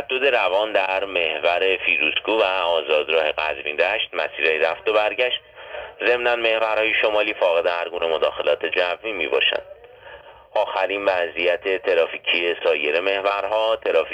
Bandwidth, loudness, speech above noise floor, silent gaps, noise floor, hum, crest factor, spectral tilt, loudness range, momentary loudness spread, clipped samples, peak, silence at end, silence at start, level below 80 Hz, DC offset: 9.4 kHz; -20 LUFS; 22 dB; none; -43 dBFS; none; 18 dB; -3.5 dB/octave; 3 LU; 5 LU; under 0.1%; -4 dBFS; 0 s; 0 s; -58 dBFS; under 0.1%